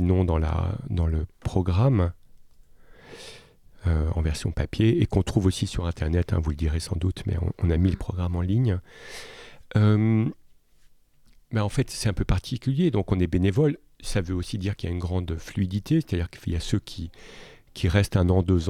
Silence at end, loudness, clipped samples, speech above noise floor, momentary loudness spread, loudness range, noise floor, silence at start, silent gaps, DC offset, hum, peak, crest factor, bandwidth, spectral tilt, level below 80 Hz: 0 s; -25 LUFS; under 0.1%; 31 dB; 13 LU; 3 LU; -55 dBFS; 0 s; none; under 0.1%; none; -8 dBFS; 16 dB; 13.5 kHz; -7 dB/octave; -36 dBFS